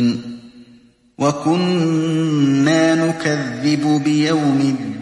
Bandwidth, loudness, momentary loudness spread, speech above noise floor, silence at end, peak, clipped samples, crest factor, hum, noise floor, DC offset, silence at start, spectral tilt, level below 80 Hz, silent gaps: 11.5 kHz; -17 LUFS; 6 LU; 33 dB; 0 s; -2 dBFS; under 0.1%; 14 dB; none; -49 dBFS; under 0.1%; 0 s; -6 dB/octave; -60 dBFS; none